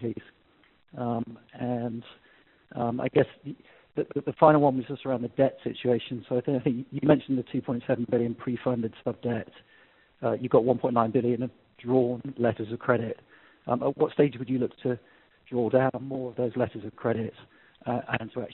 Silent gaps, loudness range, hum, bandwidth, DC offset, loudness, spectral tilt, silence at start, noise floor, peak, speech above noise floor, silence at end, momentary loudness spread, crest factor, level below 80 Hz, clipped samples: none; 5 LU; none; 4.2 kHz; under 0.1%; -28 LUFS; -7 dB/octave; 0 s; -60 dBFS; -4 dBFS; 33 dB; 0 s; 13 LU; 24 dB; -64 dBFS; under 0.1%